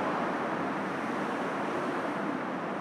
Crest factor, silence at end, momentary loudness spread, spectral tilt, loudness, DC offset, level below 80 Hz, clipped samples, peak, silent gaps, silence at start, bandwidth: 14 dB; 0 s; 2 LU; -6 dB/octave; -32 LUFS; under 0.1%; -74 dBFS; under 0.1%; -20 dBFS; none; 0 s; 13.5 kHz